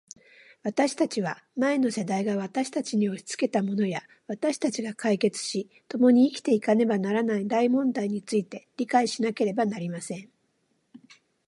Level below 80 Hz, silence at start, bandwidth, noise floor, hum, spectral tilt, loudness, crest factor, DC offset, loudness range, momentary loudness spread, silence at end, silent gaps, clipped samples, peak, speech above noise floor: -78 dBFS; 0.65 s; 11.5 kHz; -72 dBFS; none; -5.5 dB/octave; -26 LUFS; 18 dB; under 0.1%; 4 LU; 11 LU; 0.5 s; none; under 0.1%; -8 dBFS; 46 dB